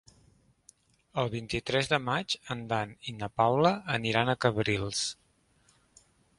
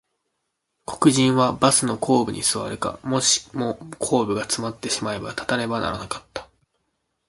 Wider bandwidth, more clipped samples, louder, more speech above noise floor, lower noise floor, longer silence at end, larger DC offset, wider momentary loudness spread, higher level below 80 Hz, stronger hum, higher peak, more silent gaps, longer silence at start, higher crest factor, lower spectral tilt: about the same, 11.5 kHz vs 12 kHz; neither; second, -30 LUFS vs -22 LUFS; second, 37 dB vs 55 dB; second, -67 dBFS vs -77 dBFS; first, 1.25 s vs 0.85 s; neither; second, 10 LU vs 13 LU; about the same, -58 dBFS vs -54 dBFS; neither; second, -8 dBFS vs -2 dBFS; neither; first, 1.15 s vs 0.9 s; about the same, 22 dB vs 22 dB; about the same, -4.5 dB/octave vs -3.5 dB/octave